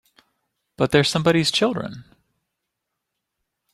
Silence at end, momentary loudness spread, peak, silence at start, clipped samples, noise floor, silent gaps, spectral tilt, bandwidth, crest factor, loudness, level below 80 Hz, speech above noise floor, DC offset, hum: 1.7 s; 11 LU; -2 dBFS; 0.8 s; under 0.1%; -80 dBFS; none; -4.5 dB/octave; 14 kHz; 22 dB; -20 LUFS; -56 dBFS; 61 dB; under 0.1%; none